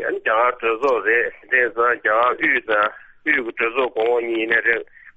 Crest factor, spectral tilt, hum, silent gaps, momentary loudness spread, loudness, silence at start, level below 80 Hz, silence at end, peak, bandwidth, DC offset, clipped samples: 16 dB; -5 dB/octave; none; none; 4 LU; -19 LUFS; 0 s; -60 dBFS; 0.05 s; -4 dBFS; 7.6 kHz; under 0.1%; under 0.1%